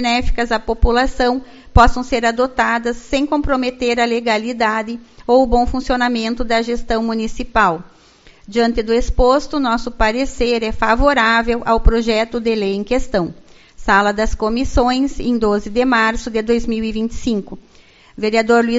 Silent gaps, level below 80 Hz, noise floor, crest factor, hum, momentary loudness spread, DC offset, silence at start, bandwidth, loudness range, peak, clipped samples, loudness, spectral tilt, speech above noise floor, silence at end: none; -26 dBFS; -46 dBFS; 16 dB; none; 7 LU; under 0.1%; 0 s; 8 kHz; 2 LU; 0 dBFS; under 0.1%; -17 LUFS; -3.5 dB/octave; 31 dB; 0 s